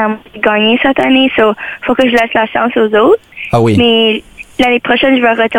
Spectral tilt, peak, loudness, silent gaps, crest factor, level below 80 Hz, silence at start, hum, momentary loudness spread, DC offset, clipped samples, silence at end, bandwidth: -6 dB/octave; 0 dBFS; -10 LUFS; none; 10 dB; -42 dBFS; 0 s; none; 7 LU; under 0.1%; under 0.1%; 0 s; 16.5 kHz